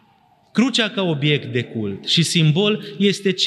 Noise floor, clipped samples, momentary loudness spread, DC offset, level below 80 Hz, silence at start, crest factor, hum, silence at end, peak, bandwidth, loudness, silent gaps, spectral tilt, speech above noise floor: -56 dBFS; under 0.1%; 9 LU; under 0.1%; -70 dBFS; 0.55 s; 16 dB; none; 0 s; -4 dBFS; 12.5 kHz; -19 LUFS; none; -5 dB/octave; 38 dB